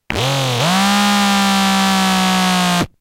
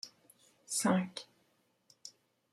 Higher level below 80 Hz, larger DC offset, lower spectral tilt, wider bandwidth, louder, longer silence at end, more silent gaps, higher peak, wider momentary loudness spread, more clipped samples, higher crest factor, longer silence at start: first, -42 dBFS vs -80 dBFS; neither; about the same, -3.5 dB/octave vs -4 dB/octave; first, 16.5 kHz vs 14.5 kHz; first, -14 LUFS vs -34 LUFS; second, 0.15 s vs 0.45 s; neither; first, 0 dBFS vs -18 dBFS; second, 3 LU vs 22 LU; neither; second, 14 dB vs 20 dB; about the same, 0.1 s vs 0.05 s